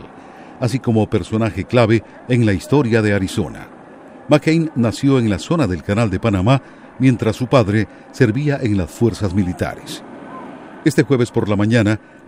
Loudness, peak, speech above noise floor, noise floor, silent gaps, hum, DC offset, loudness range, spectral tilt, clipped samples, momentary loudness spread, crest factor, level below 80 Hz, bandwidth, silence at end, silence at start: -17 LUFS; 0 dBFS; 23 dB; -39 dBFS; none; none; under 0.1%; 3 LU; -7 dB/octave; under 0.1%; 13 LU; 16 dB; -44 dBFS; 15.5 kHz; 0.3 s; 0 s